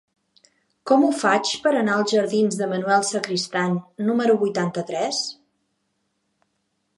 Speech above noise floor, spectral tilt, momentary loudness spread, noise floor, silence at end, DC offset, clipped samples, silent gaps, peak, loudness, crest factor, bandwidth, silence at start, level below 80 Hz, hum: 52 dB; -4.5 dB/octave; 7 LU; -73 dBFS; 1.65 s; under 0.1%; under 0.1%; none; -4 dBFS; -21 LUFS; 18 dB; 11.5 kHz; 0.85 s; -74 dBFS; none